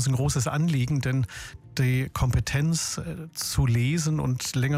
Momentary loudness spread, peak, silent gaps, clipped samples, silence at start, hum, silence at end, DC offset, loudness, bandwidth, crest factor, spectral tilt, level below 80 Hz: 9 LU; -12 dBFS; none; under 0.1%; 0 s; none; 0 s; under 0.1%; -26 LUFS; 16 kHz; 12 dB; -5 dB/octave; -40 dBFS